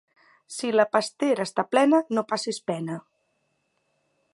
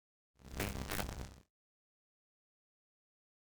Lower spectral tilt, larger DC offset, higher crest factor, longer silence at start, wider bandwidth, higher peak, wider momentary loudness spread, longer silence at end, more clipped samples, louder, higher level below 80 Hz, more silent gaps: about the same, -4.5 dB/octave vs -4 dB/octave; neither; second, 20 dB vs 30 dB; first, 0.5 s vs 0.35 s; second, 11.5 kHz vs over 20 kHz; first, -6 dBFS vs -18 dBFS; about the same, 12 LU vs 13 LU; second, 1.35 s vs 2 s; neither; first, -24 LUFS vs -43 LUFS; second, -80 dBFS vs -54 dBFS; neither